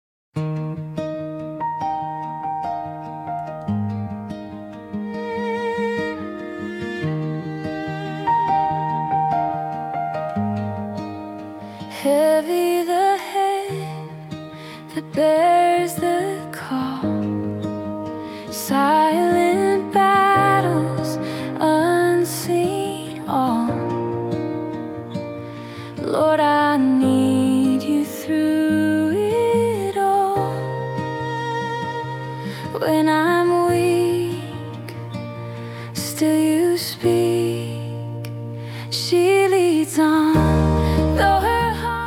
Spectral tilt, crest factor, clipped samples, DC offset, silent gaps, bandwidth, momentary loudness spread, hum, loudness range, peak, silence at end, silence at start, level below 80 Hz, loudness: -6 dB/octave; 16 dB; under 0.1%; under 0.1%; none; 17.5 kHz; 14 LU; none; 9 LU; -6 dBFS; 0 s; 0.35 s; -42 dBFS; -20 LUFS